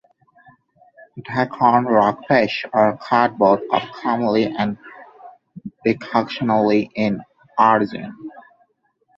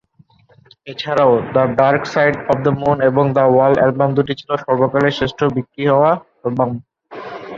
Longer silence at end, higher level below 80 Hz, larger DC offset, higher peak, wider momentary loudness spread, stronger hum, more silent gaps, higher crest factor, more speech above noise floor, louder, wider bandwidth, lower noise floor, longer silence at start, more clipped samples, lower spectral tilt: first, 0.8 s vs 0 s; second, -60 dBFS vs -50 dBFS; neither; about the same, -2 dBFS vs -2 dBFS; first, 17 LU vs 10 LU; neither; neither; about the same, 18 dB vs 14 dB; first, 47 dB vs 37 dB; second, -19 LUFS vs -15 LUFS; about the same, 7.2 kHz vs 7.4 kHz; first, -65 dBFS vs -52 dBFS; first, 1.15 s vs 0.85 s; neither; about the same, -7.5 dB/octave vs -7.5 dB/octave